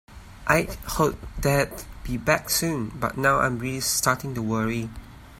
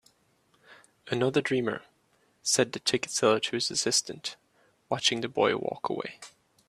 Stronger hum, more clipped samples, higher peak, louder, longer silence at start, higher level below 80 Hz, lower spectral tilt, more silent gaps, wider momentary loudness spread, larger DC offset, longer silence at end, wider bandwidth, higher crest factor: neither; neither; first, -4 dBFS vs -8 dBFS; first, -24 LUFS vs -28 LUFS; second, 0.1 s vs 0.7 s; first, -42 dBFS vs -72 dBFS; first, -4 dB/octave vs -2.5 dB/octave; neither; about the same, 10 LU vs 12 LU; neither; second, 0 s vs 0.4 s; first, 16.5 kHz vs 14.5 kHz; about the same, 22 dB vs 22 dB